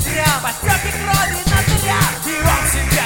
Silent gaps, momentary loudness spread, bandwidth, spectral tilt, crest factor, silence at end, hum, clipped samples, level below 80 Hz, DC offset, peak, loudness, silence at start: none; 2 LU; 17 kHz; -3.5 dB/octave; 14 dB; 0 s; none; under 0.1%; -26 dBFS; under 0.1%; -2 dBFS; -16 LUFS; 0 s